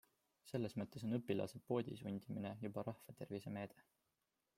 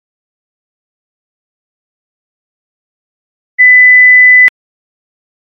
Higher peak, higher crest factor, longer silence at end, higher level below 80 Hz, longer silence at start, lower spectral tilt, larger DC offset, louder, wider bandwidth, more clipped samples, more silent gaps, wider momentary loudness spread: second, -26 dBFS vs 0 dBFS; first, 20 dB vs 12 dB; second, 0.75 s vs 1.1 s; second, -80 dBFS vs -72 dBFS; second, 0.45 s vs 3.6 s; first, -7.5 dB/octave vs -0.5 dB/octave; neither; second, -46 LUFS vs -2 LUFS; first, 16 kHz vs 3.8 kHz; neither; neither; about the same, 8 LU vs 6 LU